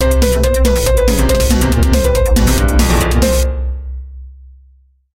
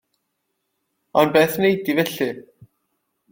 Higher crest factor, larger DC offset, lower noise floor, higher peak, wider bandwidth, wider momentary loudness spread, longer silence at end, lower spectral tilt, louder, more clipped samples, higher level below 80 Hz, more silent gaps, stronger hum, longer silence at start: second, 12 dB vs 20 dB; neither; second, -48 dBFS vs -75 dBFS; about the same, 0 dBFS vs -2 dBFS; about the same, 16.5 kHz vs 17 kHz; about the same, 11 LU vs 10 LU; second, 0.65 s vs 0.9 s; about the same, -5 dB/octave vs -5 dB/octave; first, -13 LUFS vs -19 LUFS; neither; first, -14 dBFS vs -62 dBFS; neither; neither; second, 0 s vs 1.15 s